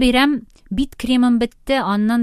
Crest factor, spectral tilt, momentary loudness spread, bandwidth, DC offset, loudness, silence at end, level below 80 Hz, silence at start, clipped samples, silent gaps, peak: 16 dB; -5 dB/octave; 9 LU; 14 kHz; under 0.1%; -18 LUFS; 0 s; -36 dBFS; 0 s; under 0.1%; none; -2 dBFS